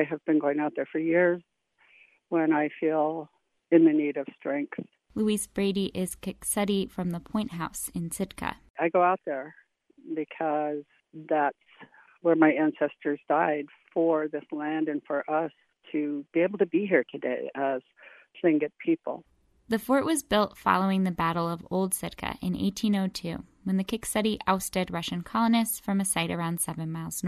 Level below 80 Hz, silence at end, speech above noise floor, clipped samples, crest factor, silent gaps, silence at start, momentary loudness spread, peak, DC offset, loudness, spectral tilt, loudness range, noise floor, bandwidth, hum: -60 dBFS; 0 s; 35 dB; under 0.1%; 22 dB; 8.70-8.74 s; 0 s; 10 LU; -6 dBFS; under 0.1%; -28 LUFS; -5 dB/octave; 3 LU; -62 dBFS; 13.5 kHz; none